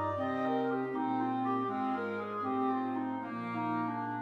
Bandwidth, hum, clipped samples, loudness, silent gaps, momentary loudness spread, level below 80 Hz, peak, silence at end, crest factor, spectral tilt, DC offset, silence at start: 6 kHz; none; under 0.1%; -34 LUFS; none; 4 LU; -80 dBFS; -22 dBFS; 0 s; 12 dB; -8.5 dB/octave; under 0.1%; 0 s